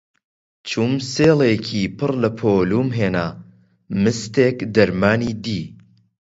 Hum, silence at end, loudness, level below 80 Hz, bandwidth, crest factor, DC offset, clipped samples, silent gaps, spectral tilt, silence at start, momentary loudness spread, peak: none; 0.45 s; -19 LUFS; -48 dBFS; 8 kHz; 18 dB; under 0.1%; under 0.1%; none; -6 dB/octave; 0.65 s; 11 LU; 0 dBFS